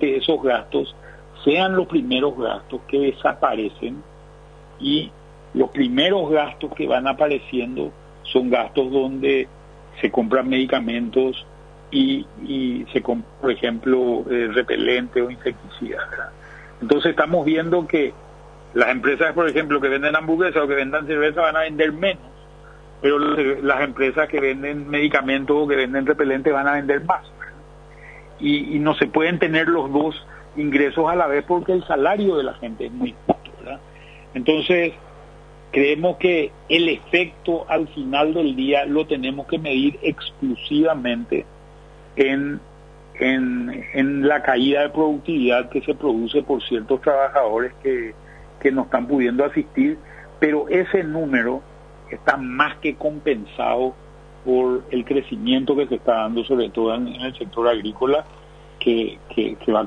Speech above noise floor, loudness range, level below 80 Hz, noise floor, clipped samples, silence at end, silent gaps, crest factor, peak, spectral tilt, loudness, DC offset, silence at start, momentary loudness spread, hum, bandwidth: 24 dB; 3 LU; -48 dBFS; -44 dBFS; under 0.1%; 0 s; none; 20 dB; -2 dBFS; -6.5 dB/octave; -20 LUFS; under 0.1%; 0 s; 9 LU; 50 Hz at -45 dBFS; 9.4 kHz